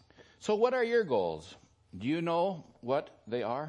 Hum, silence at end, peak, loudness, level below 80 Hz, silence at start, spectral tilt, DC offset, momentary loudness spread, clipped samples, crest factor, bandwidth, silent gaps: none; 0 s; -14 dBFS; -32 LUFS; -72 dBFS; 0.2 s; -6 dB/octave; under 0.1%; 14 LU; under 0.1%; 18 dB; 10 kHz; none